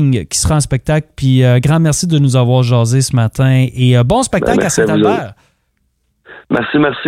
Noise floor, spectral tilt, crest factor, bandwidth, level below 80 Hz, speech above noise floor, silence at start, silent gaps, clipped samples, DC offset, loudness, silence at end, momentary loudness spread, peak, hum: -63 dBFS; -5.5 dB/octave; 12 dB; 13.5 kHz; -34 dBFS; 51 dB; 0 s; none; under 0.1%; under 0.1%; -12 LUFS; 0 s; 5 LU; 0 dBFS; none